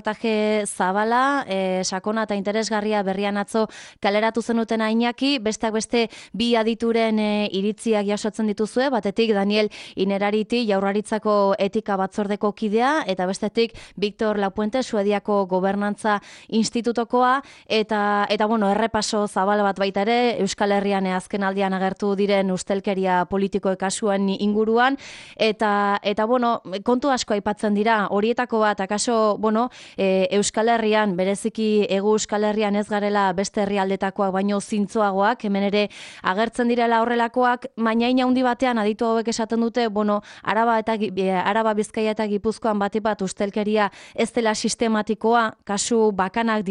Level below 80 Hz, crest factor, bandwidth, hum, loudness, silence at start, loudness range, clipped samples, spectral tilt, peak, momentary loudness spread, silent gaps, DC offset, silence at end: -58 dBFS; 16 dB; 11.5 kHz; none; -22 LUFS; 0.05 s; 2 LU; under 0.1%; -4.5 dB/octave; -6 dBFS; 5 LU; none; under 0.1%; 0 s